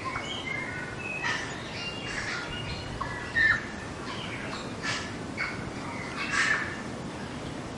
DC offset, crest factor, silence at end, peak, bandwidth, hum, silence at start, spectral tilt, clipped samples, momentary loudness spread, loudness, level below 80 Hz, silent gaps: under 0.1%; 20 dB; 0 s; -12 dBFS; 11.5 kHz; none; 0 s; -3.5 dB/octave; under 0.1%; 12 LU; -31 LUFS; -52 dBFS; none